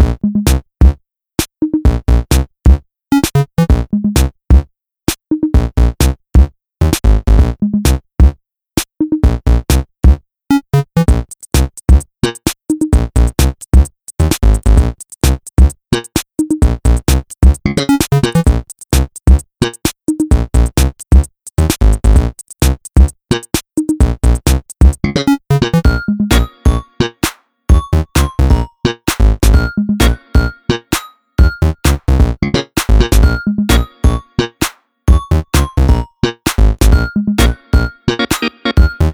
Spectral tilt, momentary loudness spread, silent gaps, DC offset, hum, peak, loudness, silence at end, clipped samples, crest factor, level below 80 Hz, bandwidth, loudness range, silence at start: -5.5 dB/octave; 6 LU; none; under 0.1%; none; 0 dBFS; -14 LUFS; 0 s; 0.3%; 12 dB; -14 dBFS; over 20 kHz; 1 LU; 0 s